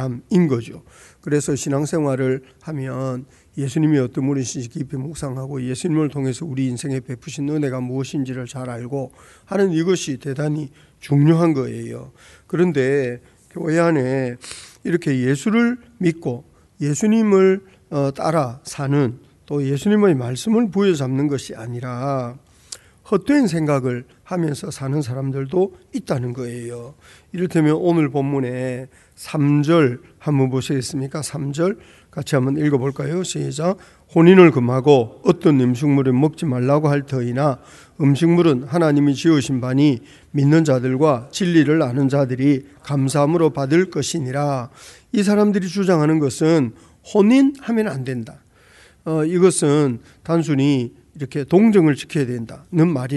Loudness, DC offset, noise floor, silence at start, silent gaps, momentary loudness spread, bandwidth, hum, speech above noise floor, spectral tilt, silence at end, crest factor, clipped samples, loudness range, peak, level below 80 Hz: -19 LUFS; under 0.1%; -50 dBFS; 0 s; none; 13 LU; 12 kHz; none; 31 dB; -6.5 dB/octave; 0 s; 18 dB; under 0.1%; 7 LU; 0 dBFS; -56 dBFS